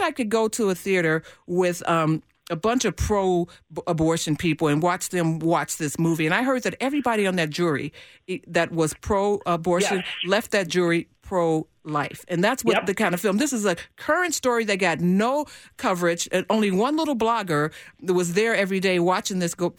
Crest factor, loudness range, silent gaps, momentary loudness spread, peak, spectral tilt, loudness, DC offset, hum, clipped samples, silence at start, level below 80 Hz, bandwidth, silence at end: 16 dB; 1 LU; none; 6 LU; -8 dBFS; -4.5 dB/octave; -23 LUFS; under 0.1%; none; under 0.1%; 0 s; -48 dBFS; over 20 kHz; 0.05 s